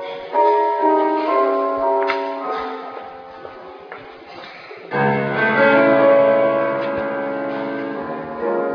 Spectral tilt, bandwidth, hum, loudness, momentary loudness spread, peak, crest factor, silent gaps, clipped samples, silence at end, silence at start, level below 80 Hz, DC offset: -8 dB/octave; 5.4 kHz; none; -18 LUFS; 23 LU; -4 dBFS; 16 dB; none; under 0.1%; 0 s; 0 s; -60 dBFS; under 0.1%